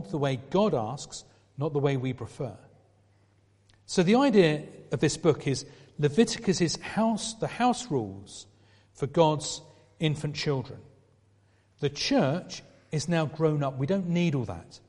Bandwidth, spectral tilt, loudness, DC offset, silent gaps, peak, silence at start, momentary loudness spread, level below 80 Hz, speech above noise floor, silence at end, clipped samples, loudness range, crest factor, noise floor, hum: 11.5 kHz; -5.5 dB/octave; -28 LUFS; under 0.1%; none; -8 dBFS; 0 s; 14 LU; -60 dBFS; 37 dB; 0.1 s; under 0.1%; 5 LU; 22 dB; -64 dBFS; none